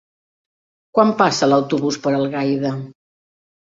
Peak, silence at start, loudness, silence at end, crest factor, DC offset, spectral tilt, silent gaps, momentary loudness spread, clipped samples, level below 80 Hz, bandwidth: -2 dBFS; 0.95 s; -18 LUFS; 0.75 s; 18 dB; under 0.1%; -5.5 dB/octave; none; 10 LU; under 0.1%; -62 dBFS; 7.8 kHz